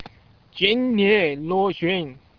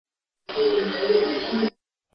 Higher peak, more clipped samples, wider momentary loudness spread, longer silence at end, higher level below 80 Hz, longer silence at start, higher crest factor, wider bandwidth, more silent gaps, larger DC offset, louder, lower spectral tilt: first, -4 dBFS vs -8 dBFS; neither; about the same, 7 LU vs 6 LU; second, 0.25 s vs 0.45 s; about the same, -56 dBFS vs -60 dBFS; second, 0 s vs 0.5 s; about the same, 18 dB vs 16 dB; second, 5.4 kHz vs 6.2 kHz; neither; neither; first, -20 LUFS vs -24 LUFS; first, -7.5 dB/octave vs -6 dB/octave